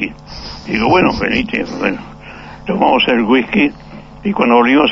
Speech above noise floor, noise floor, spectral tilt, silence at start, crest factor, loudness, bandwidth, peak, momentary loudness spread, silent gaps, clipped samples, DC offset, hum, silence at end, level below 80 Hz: 20 dB; -33 dBFS; -6 dB/octave; 0 s; 14 dB; -14 LUFS; 7.2 kHz; 0 dBFS; 18 LU; none; under 0.1%; under 0.1%; 50 Hz at -40 dBFS; 0 s; -38 dBFS